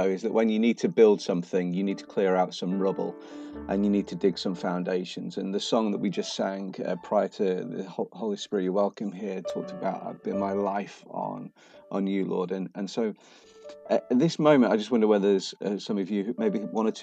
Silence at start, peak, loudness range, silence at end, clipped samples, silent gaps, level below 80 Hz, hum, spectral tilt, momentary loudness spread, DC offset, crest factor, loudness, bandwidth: 0 s; -8 dBFS; 6 LU; 0 s; under 0.1%; none; -64 dBFS; none; -6 dB/octave; 12 LU; under 0.1%; 20 dB; -27 LUFS; 8.8 kHz